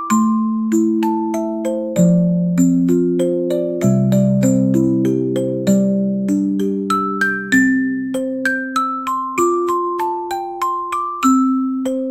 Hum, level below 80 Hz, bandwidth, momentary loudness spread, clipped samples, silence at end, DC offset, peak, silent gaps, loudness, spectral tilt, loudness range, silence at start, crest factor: none; -54 dBFS; 15.5 kHz; 7 LU; under 0.1%; 0 s; under 0.1%; -2 dBFS; none; -17 LUFS; -6.5 dB/octave; 3 LU; 0 s; 14 dB